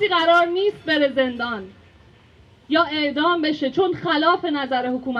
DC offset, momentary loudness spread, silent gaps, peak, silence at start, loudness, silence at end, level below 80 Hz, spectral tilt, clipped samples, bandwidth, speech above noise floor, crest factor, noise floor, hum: under 0.1%; 7 LU; none; -6 dBFS; 0 s; -20 LUFS; 0 s; -60 dBFS; -5.5 dB/octave; under 0.1%; 7.8 kHz; 31 dB; 16 dB; -51 dBFS; none